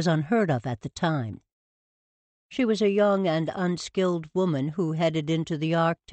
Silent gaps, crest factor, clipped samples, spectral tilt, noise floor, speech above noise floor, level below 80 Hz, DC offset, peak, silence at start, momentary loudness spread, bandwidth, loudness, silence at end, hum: 1.52-2.50 s; 14 dB; under 0.1%; -6.5 dB/octave; under -90 dBFS; over 65 dB; -62 dBFS; under 0.1%; -12 dBFS; 0 s; 7 LU; 8.4 kHz; -26 LUFS; 0.2 s; none